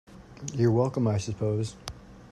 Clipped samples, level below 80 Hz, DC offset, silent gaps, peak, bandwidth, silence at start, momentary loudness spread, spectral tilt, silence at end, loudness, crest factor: under 0.1%; -54 dBFS; under 0.1%; none; -12 dBFS; 12 kHz; 0.1 s; 18 LU; -7 dB/octave; 0.05 s; -28 LUFS; 16 dB